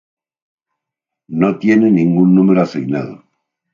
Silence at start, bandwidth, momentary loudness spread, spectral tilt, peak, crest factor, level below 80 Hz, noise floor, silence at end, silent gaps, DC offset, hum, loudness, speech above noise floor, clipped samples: 1.3 s; 7 kHz; 12 LU; -9 dB/octave; 0 dBFS; 14 dB; -58 dBFS; -82 dBFS; 0.55 s; none; under 0.1%; none; -13 LUFS; 70 dB; under 0.1%